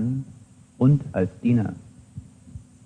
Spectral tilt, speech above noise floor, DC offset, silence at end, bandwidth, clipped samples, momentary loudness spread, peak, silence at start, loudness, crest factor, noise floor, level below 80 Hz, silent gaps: -10 dB/octave; 27 dB; under 0.1%; 0.25 s; 9.6 kHz; under 0.1%; 24 LU; -8 dBFS; 0 s; -23 LUFS; 16 dB; -48 dBFS; -52 dBFS; none